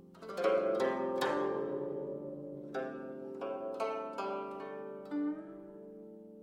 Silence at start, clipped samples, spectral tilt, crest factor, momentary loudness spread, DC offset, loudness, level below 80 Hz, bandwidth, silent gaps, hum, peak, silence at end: 0 s; under 0.1%; -5.5 dB/octave; 20 dB; 17 LU; under 0.1%; -37 LUFS; -78 dBFS; 16.5 kHz; none; none; -18 dBFS; 0 s